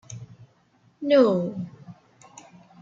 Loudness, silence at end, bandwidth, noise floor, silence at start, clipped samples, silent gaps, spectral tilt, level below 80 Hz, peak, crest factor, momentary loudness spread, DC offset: -22 LUFS; 0.9 s; 7.6 kHz; -62 dBFS; 0.1 s; under 0.1%; none; -6.5 dB/octave; -70 dBFS; -6 dBFS; 20 dB; 23 LU; under 0.1%